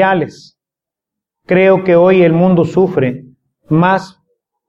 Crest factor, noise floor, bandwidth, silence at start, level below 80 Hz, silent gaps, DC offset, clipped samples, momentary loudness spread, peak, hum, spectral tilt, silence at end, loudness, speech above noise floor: 12 dB; -86 dBFS; 7.8 kHz; 0 s; -52 dBFS; none; under 0.1%; under 0.1%; 9 LU; 0 dBFS; none; -8.5 dB/octave; 0.6 s; -11 LUFS; 75 dB